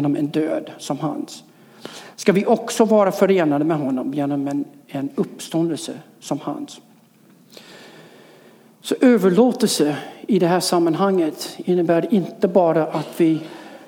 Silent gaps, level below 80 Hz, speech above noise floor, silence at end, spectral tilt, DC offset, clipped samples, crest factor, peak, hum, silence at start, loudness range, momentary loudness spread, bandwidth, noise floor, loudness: none; -74 dBFS; 33 dB; 0.05 s; -5.5 dB/octave; under 0.1%; under 0.1%; 18 dB; -2 dBFS; none; 0 s; 10 LU; 16 LU; 18 kHz; -52 dBFS; -20 LUFS